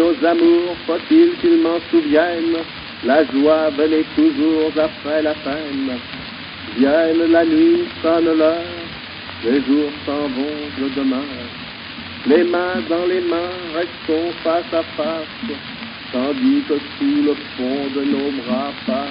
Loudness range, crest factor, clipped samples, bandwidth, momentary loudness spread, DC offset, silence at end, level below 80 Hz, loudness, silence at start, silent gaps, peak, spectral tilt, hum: 5 LU; 16 dB; under 0.1%; 5.4 kHz; 13 LU; under 0.1%; 0 s; -52 dBFS; -18 LUFS; 0 s; none; -2 dBFS; -3 dB/octave; none